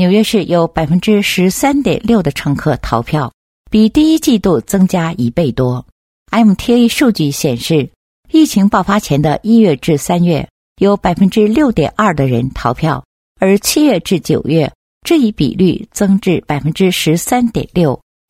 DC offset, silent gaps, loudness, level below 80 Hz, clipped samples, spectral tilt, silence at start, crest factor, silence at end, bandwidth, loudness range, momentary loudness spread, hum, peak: under 0.1%; 3.34-3.65 s, 5.92-6.26 s, 7.96-8.23 s, 10.50-10.76 s, 13.05-13.35 s, 14.75-15.01 s; -13 LUFS; -36 dBFS; under 0.1%; -6 dB/octave; 0 s; 12 dB; 0.35 s; 16.5 kHz; 2 LU; 6 LU; none; 0 dBFS